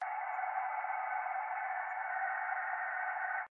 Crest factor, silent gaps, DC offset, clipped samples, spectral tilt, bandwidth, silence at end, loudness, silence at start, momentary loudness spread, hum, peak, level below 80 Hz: 12 dB; none; under 0.1%; under 0.1%; 15 dB/octave; 3.2 kHz; 0.05 s; -37 LUFS; 0 s; 2 LU; none; -24 dBFS; under -90 dBFS